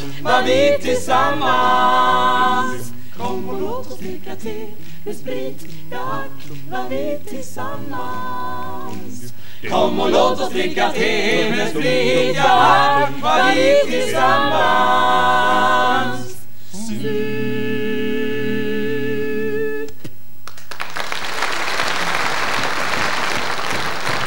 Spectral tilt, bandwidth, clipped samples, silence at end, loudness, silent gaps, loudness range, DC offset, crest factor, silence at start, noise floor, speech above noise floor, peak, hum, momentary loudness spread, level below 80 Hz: -4 dB/octave; 16.5 kHz; under 0.1%; 0 s; -18 LUFS; none; 13 LU; 10%; 18 dB; 0 s; -41 dBFS; 24 dB; 0 dBFS; none; 17 LU; -54 dBFS